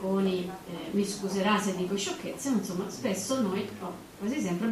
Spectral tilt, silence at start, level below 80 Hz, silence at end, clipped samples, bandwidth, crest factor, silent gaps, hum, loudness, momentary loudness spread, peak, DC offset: -5 dB/octave; 0 s; -64 dBFS; 0 s; under 0.1%; 15 kHz; 18 dB; none; none; -31 LUFS; 10 LU; -12 dBFS; under 0.1%